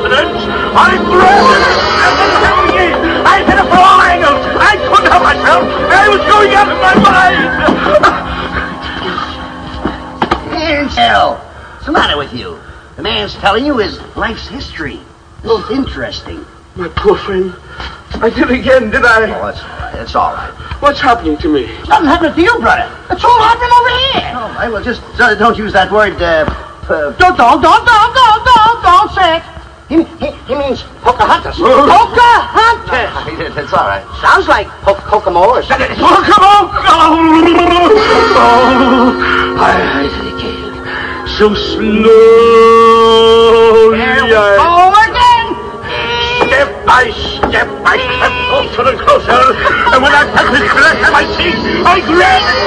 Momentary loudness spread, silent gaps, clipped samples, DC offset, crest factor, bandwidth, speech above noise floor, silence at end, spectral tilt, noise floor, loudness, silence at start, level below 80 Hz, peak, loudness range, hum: 14 LU; none; 3%; under 0.1%; 8 dB; 11 kHz; 21 dB; 0 s; -4.5 dB/octave; -29 dBFS; -8 LUFS; 0 s; -30 dBFS; 0 dBFS; 8 LU; none